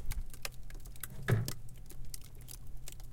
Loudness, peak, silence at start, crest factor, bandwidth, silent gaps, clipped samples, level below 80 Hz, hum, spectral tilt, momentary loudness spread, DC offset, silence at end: -41 LUFS; -20 dBFS; 0 s; 18 dB; 17 kHz; none; under 0.1%; -44 dBFS; none; -5 dB/octave; 17 LU; under 0.1%; 0 s